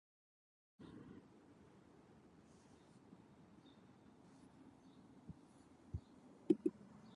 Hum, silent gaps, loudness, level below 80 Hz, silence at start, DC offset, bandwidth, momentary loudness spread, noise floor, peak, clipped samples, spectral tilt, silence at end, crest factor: none; none; -46 LUFS; -68 dBFS; 0.8 s; under 0.1%; 10.5 kHz; 25 LU; -66 dBFS; -20 dBFS; under 0.1%; -8.5 dB/octave; 0 s; 32 dB